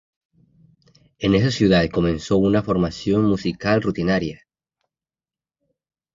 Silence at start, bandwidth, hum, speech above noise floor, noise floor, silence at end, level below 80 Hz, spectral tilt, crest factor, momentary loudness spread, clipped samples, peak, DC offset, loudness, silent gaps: 1.2 s; 7.6 kHz; none; over 71 dB; under -90 dBFS; 1.8 s; -44 dBFS; -7 dB/octave; 18 dB; 6 LU; under 0.1%; -4 dBFS; under 0.1%; -20 LUFS; none